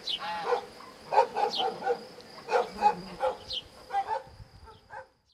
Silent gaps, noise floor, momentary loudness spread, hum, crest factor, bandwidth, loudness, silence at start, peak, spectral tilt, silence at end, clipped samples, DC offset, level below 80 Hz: none; -52 dBFS; 20 LU; none; 22 dB; 14 kHz; -30 LUFS; 0 s; -10 dBFS; -3 dB/octave; 0.3 s; under 0.1%; under 0.1%; -62 dBFS